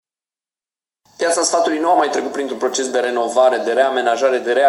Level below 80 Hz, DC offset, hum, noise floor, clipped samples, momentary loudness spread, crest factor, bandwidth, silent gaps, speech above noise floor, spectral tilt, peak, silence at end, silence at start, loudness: -70 dBFS; under 0.1%; none; under -90 dBFS; under 0.1%; 6 LU; 16 dB; 12.5 kHz; none; over 74 dB; -1.5 dB/octave; -2 dBFS; 0 s; 1.2 s; -17 LUFS